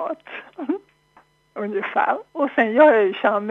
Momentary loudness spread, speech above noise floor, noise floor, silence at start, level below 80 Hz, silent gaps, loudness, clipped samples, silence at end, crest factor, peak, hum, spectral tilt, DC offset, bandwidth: 18 LU; 37 dB; -57 dBFS; 0 s; -72 dBFS; none; -20 LUFS; under 0.1%; 0 s; 20 dB; -2 dBFS; none; -7 dB/octave; under 0.1%; 4.2 kHz